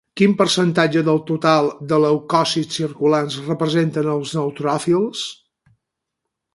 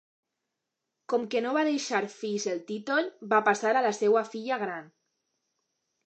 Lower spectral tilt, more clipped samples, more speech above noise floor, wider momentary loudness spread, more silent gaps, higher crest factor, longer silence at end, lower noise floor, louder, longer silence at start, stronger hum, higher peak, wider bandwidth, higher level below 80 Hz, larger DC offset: first, -5.5 dB/octave vs -3.5 dB/octave; neither; first, 62 dB vs 57 dB; about the same, 7 LU vs 8 LU; neither; about the same, 18 dB vs 20 dB; about the same, 1.2 s vs 1.2 s; second, -80 dBFS vs -85 dBFS; first, -18 LUFS vs -28 LUFS; second, 0.15 s vs 1.1 s; neither; first, 0 dBFS vs -8 dBFS; first, 11.5 kHz vs 8.8 kHz; first, -62 dBFS vs -86 dBFS; neither